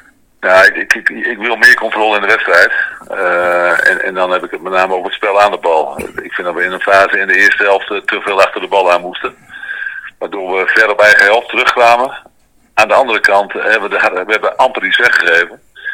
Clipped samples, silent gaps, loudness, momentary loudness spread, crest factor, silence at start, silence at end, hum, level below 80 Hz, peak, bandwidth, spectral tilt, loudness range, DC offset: 1%; none; -10 LUFS; 13 LU; 12 dB; 0.4 s; 0 s; none; -52 dBFS; 0 dBFS; over 20 kHz; -2.5 dB/octave; 3 LU; under 0.1%